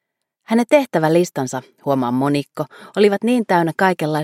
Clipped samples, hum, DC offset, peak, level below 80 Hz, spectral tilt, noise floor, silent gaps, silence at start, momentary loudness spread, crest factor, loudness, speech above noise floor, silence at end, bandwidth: under 0.1%; none; under 0.1%; 0 dBFS; -66 dBFS; -6 dB/octave; -48 dBFS; none; 0.5 s; 11 LU; 18 dB; -18 LUFS; 31 dB; 0 s; 16.5 kHz